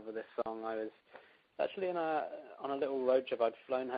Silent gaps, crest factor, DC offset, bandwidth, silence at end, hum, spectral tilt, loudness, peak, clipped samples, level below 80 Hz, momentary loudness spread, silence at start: none; 18 dB; under 0.1%; 4.9 kHz; 0 s; none; -3 dB/octave; -37 LUFS; -18 dBFS; under 0.1%; -82 dBFS; 12 LU; 0 s